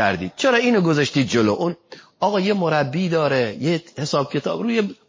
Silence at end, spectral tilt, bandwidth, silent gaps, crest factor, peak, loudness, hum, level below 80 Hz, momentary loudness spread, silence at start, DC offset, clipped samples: 0.15 s; -5.5 dB/octave; 7.6 kHz; none; 16 dB; -4 dBFS; -20 LUFS; none; -56 dBFS; 6 LU; 0 s; under 0.1%; under 0.1%